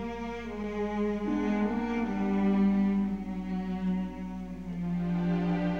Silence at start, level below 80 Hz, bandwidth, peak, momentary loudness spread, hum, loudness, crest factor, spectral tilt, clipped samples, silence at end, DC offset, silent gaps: 0 s; -50 dBFS; 6.8 kHz; -18 dBFS; 11 LU; none; -31 LUFS; 12 dB; -9 dB/octave; under 0.1%; 0 s; 0.3%; none